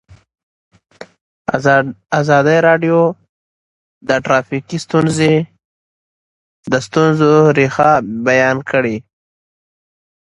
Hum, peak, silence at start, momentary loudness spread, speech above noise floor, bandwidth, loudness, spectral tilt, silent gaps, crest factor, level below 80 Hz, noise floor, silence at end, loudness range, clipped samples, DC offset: none; 0 dBFS; 1 s; 12 LU; over 77 dB; 11 kHz; -13 LUFS; -6 dB/octave; 1.21-1.45 s, 3.29-4.01 s, 5.65-6.63 s; 16 dB; -54 dBFS; under -90 dBFS; 1.3 s; 4 LU; under 0.1%; under 0.1%